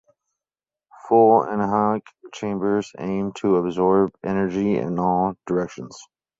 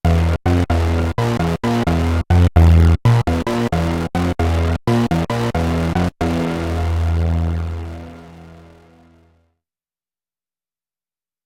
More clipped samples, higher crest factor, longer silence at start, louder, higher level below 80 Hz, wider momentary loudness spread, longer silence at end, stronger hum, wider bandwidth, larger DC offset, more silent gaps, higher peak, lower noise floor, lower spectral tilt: neither; about the same, 18 dB vs 16 dB; first, 1.05 s vs 0.05 s; second, -21 LUFS vs -17 LUFS; second, -56 dBFS vs -28 dBFS; first, 12 LU vs 8 LU; second, 0.35 s vs 2.85 s; neither; second, 7.8 kHz vs 12 kHz; neither; neither; about the same, -4 dBFS vs -2 dBFS; about the same, under -90 dBFS vs under -90 dBFS; about the same, -7.5 dB/octave vs -7.5 dB/octave